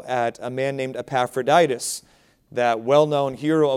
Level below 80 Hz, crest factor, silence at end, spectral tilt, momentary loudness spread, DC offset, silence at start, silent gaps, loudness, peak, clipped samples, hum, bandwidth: -64 dBFS; 18 dB; 0 s; -4.5 dB/octave; 10 LU; under 0.1%; 0 s; none; -21 LUFS; -4 dBFS; under 0.1%; none; 16 kHz